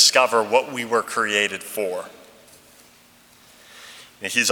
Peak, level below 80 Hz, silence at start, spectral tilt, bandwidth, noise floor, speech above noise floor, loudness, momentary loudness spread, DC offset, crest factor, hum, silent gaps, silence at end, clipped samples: 0 dBFS; -70 dBFS; 0 s; -0.5 dB/octave; over 20 kHz; -53 dBFS; 31 dB; -21 LUFS; 23 LU; under 0.1%; 22 dB; none; none; 0 s; under 0.1%